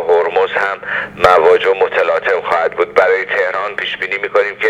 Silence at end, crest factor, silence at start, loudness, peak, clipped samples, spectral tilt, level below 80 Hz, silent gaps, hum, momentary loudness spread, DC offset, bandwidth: 0 s; 14 dB; 0 s; -14 LUFS; 0 dBFS; under 0.1%; -4 dB/octave; -48 dBFS; none; none; 8 LU; under 0.1%; 10.5 kHz